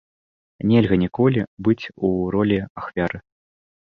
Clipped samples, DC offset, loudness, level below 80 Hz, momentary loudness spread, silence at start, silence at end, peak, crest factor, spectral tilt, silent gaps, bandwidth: under 0.1%; under 0.1%; -21 LUFS; -46 dBFS; 9 LU; 0.65 s; 0.65 s; -4 dBFS; 18 dB; -9.5 dB/octave; 1.47-1.57 s, 2.70-2.75 s; 6.2 kHz